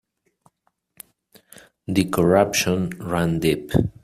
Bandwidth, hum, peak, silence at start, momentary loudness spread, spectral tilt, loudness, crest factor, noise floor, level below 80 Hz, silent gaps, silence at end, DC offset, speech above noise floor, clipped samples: 16 kHz; none; -2 dBFS; 1.9 s; 8 LU; -5.5 dB/octave; -21 LUFS; 20 dB; -68 dBFS; -46 dBFS; none; 0.15 s; under 0.1%; 48 dB; under 0.1%